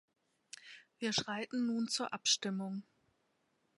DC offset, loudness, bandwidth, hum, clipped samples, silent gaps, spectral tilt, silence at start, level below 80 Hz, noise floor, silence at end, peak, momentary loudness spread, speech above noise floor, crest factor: under 0.1%; -36 LUFS; 11.5 kHz; none; under 0.1%; none; -2.5 dB/octave; 0.6 s; -80 dBFS; -79 dBFS; 0.95 s; -18 dBFS; 20 LU; 42 dB; 22 dB